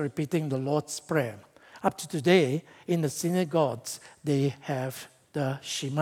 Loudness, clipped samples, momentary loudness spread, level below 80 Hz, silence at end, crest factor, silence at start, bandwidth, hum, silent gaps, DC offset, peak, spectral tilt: -29 LUFS; under 0.1%; 13 LU; -74 dBFS; 0 s; 22 dB; 0 s; 17.5 kHz; none; none; under 0.1%; -8 dBFS; -5.5 dB/octave